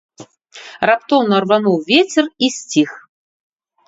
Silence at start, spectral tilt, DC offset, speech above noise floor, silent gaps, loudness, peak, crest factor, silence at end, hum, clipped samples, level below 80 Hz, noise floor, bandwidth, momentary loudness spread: 0.2 s; -4 dB/octave; under 0.1%; 25 dB; none; -15 LUFS; 0 dBFS; 18 dB; 0.9 s; none; under 0.1%; -62 dBFS; -40 dBFS; 8 kHz; 7 LU